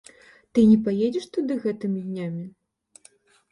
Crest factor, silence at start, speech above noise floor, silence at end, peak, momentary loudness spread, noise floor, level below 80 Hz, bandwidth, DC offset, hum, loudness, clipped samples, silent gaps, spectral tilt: 18 dB; 0.55 s; 35 dB; 1.05 s; -8 dBFS; 15 LU; -57 dBFS; -60 dBFS; 10.5 kHz; under 0.1%; none; -23 LUFS; under 0.1%; none; -8 dB/octave